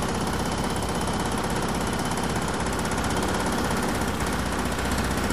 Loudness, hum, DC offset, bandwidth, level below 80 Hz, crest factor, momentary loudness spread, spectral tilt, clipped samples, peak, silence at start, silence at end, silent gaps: -26 LUFS; none; 1%; 15.5 kHz; -36 dBFS; 14 dB; 1 LU; -4.5 dB/octave; under 0.1%; -12 dBFS; 0 s; 0 s; none